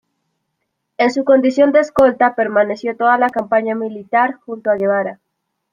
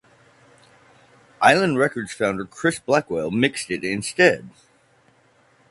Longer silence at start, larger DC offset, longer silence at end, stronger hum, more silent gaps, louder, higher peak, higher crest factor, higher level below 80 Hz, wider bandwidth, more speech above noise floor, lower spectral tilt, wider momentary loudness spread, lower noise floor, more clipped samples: second, 1 s vs 1.4 s; neither; second, 0.6 s vs 1.2 s; neither; neither; first, -15 LUFS vs -21 LUFS; about the same, -2 dBFS vs 0 dBFS; second, 14 dB vs 22 dB; about the same, -56 dBFS vs -58 dBFS; second, 9.6 kHz vs 11.5 kHz; first, 59 dB vs 38 dB; first, -6 dB/octave vs -4.5 dB/octave; about the same, 7 LU vs 9 LU; first, -74 dBFS vs -58 dBFS; neither